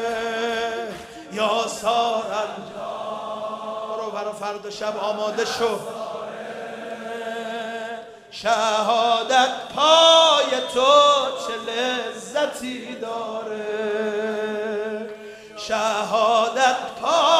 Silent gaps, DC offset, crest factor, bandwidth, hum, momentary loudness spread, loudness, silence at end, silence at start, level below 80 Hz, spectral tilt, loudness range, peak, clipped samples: none; under 0.1%; 20 dB; 15 kHz; none; 16 LU; -21 LUFS; 0 s; 0 s; -64 dBFS; -2 dB/octave; 11 LU; -2 dBFS; under 0.1%